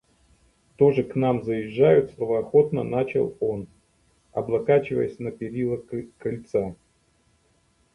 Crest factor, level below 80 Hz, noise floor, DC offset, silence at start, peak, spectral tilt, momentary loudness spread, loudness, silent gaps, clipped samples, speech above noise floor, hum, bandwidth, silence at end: 18 dB; -58 dBFS; -65 dBFS; under 0.1%; 0.8 s; -6 dBFS; -9 dB/octave; 12 LU; -24 LUFS; none; under 0.1%; 42 dB; none; 5.8 kHz; 1.2 s